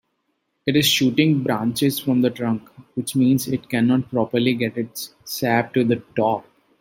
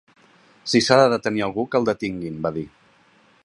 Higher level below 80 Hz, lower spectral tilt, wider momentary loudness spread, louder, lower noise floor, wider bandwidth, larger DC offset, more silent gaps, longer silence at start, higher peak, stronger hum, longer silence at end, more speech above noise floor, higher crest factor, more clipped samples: about the same, -60 dBFS vs -56 dBFS; about the same, -5 dB/octave vs -4.5 dB/octave; second, 12 LU vs 16 LU; about the same, -21 LUFS vs -21 LUFS; first, -72 dBFS vs -57 dBFS; first, 16.5 kHz vs 11.5 kHz; neither; neither; about the same, 0.65 s vs 0.65 s; about the same, -2 dBFS vs 0 dBFS; neither; second, 0.4 s vs 0.75 s; first, 52 dB vs 36 dB; about the same, 18 dB vs 22 dB; neither